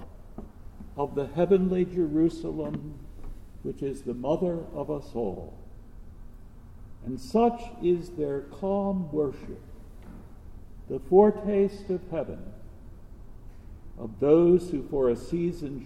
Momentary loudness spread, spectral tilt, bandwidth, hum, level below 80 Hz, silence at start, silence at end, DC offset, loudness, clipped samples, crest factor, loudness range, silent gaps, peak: 24 LU; -8.5 dB/octave; 12 kHz; none; -46 dBFS; 0 s; 0 s; under 0.1%; -27 LUFS; under 0.1%; 22 dB; 6 LU; none; -6 dBFS